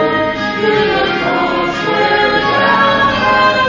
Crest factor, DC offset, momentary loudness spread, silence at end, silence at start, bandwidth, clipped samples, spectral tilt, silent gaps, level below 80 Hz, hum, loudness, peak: 12 dB; under 0.1%; 5 LU; 0 s; 0 s; 7.6 kHz; under 0.1%; -5 dB/octave; none; -40 dBFS; none; -12 LUFS; 0 dBFS